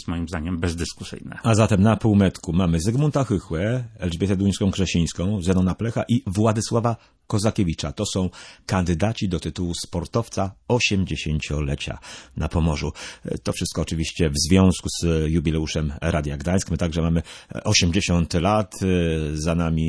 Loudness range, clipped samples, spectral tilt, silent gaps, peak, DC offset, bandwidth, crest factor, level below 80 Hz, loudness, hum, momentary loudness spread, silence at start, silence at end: 4 LU; under 0.1%; -5.5 dB/octave; none; -4 dBFS; under 0.1%; 11 kHz; 18 dB; -36 dBFS; -23 LUFS; none; 10 LU; 0 s; 0 s